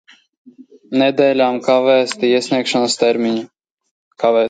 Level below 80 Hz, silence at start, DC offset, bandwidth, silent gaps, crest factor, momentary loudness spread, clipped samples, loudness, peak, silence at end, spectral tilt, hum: -68 dBFS; 0.6 s; under 0.1%; 9.4 kHz; 3.71-3.77 s, 3.91-4.11 s; 16 dB; 7 LU; under 0.1%; -15 LUFS; 0 dBFS; 0 s; -4 dB/octave; none